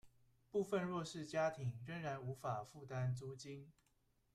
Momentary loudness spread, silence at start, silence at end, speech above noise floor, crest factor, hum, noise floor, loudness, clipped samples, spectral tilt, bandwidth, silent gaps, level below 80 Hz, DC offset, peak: 10 LU; 0.05 s; 0.65 s; 36 dB; 16 dB; none; -79 dBFS; -44 LUFS; under 0.1%; -6.5 dB/octave; 13.5 kHz; none; -74 dBFS; under 0.1%; -28 dBFS